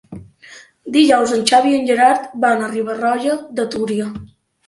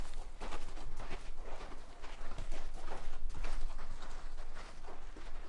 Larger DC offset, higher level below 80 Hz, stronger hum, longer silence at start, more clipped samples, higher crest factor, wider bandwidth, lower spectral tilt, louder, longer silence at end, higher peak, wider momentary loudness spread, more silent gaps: neither; second, -56 dBFS vs -40 dBFS; neither; about the same, 0.1 s vs 0 s; neither; about the same, 16 dB vs 12 dB; first, 11.5 kHz vs 8 kHz; about the same, -4 dB/octave vs -4.5 dB/octave; first, -16 LUFS vs -49 LUFS; first, 0.4 s vs 0 s; first, 0 dBFS vs -22 dBFS; first, 12 LU vs 6 LU; neither